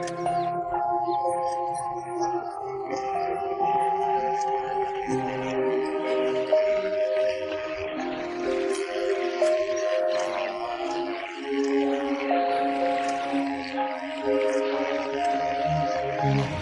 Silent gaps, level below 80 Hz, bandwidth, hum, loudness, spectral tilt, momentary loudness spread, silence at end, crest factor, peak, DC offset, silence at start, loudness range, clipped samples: none; -58 dBFS; 11.5 kHz; none; -27 LUFS; -5.5 dB/octave; 6 LU; 0 s; 16 dB; -10 dBFS; under 0.1%; 0 s; 2 LU; under 0.1%